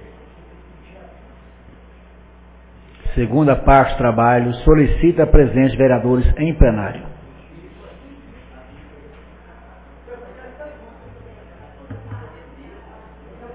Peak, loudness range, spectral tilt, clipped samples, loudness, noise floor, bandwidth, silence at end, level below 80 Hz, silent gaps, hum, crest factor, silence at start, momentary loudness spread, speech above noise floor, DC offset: 0 dBFS; 24 LU; -12 dB/octave; under 0.1%; -15 LUFS; -44 dBFS; 4 kHz; 0 s; -26 dBFS; none; none; 18 dB; 3.05 s; 24 LU; 31 dB; under 0.1%